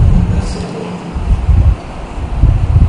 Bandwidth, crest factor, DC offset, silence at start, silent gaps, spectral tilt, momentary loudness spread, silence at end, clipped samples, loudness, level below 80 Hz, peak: 10 kHz; 12 dB; under 0.1%; 0 s; none; -8 dB/octave; 11 LU; 0 s; 0.5%; -15 LUFS; -14 dBFS; 0 dBFS